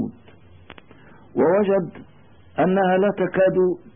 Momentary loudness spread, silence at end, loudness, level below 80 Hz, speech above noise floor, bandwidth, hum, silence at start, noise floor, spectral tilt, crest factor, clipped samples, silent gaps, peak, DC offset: 13 LU; 0.05 s; -20 LUFS; -60 dBFS; 30 dB; 3.6 kHz; none; 0 s; -49 dBFS; -12 dB/octave; 14 dB; under 0.1%; none; -8 dBFS; 0.3%